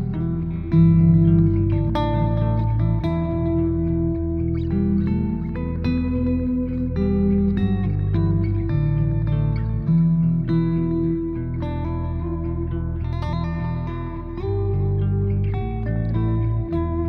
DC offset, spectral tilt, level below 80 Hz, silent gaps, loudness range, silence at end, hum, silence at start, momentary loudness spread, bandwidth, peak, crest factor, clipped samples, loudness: under 0.1%; -11.5 dB/octave; -30 dBFS; none; 6 LU; 0 s; none; 0 s; 8 LU; 4.7 kHz; -4 dBFS; 16 dB; under 0.1%; -22 LUFS